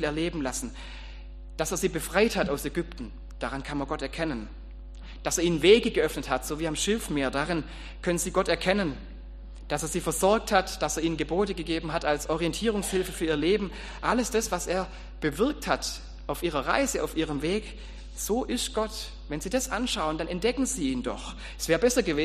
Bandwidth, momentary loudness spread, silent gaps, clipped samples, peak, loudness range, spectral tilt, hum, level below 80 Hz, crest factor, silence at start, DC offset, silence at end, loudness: 15 kHz; 15 LU; none; under 0.1%; -6 dBFS; 4 LU; -4 dB/octave; none; -42 dBFS; 22 dB; 0 s; under 0.1%; 0 s; -28 LUFS